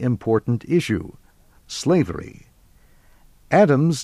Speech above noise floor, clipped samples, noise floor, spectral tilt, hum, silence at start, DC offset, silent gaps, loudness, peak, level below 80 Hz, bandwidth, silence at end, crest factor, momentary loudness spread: 33 dB; under 0.1%; -53 dBFS; -6.5 dB/octave; none; 0 s; under 0.1%; none; -20 LUFS; -4 dBFS; -50 dBFS; 13.5 kHz; 0 s; 18 dB; 17 LU